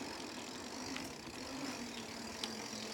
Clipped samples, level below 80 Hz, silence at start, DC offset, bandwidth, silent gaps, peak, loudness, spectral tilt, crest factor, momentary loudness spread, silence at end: under 0.1%; -68 dBFS; 0 s; under 0.1%; 19.5 kHz; none; -20 dBFS; -44 LUFS; -2.5 dB/octave; 26 dB; 3 LU; 0 s